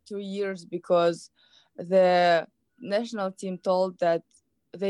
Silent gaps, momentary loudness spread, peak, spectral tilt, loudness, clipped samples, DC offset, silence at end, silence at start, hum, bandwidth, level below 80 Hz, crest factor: none; 16 LU; -10 dBFS; -5.5 dB/octave; -26 LUFS; under 0.1%; under 0.1%; 0 s; 0.1 s; none; 11 kHz; -80 dBFS; 16 dB